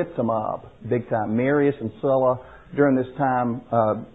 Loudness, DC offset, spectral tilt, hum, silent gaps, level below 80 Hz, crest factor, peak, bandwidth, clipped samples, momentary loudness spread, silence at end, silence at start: -23 LUFS; 0.2%; -11 dB/octave; none; none; -56 dBFS; 16 dB; -6 dBFS; 4 kHz; under 0.1%; 8 LU; 0.1 s; 0 s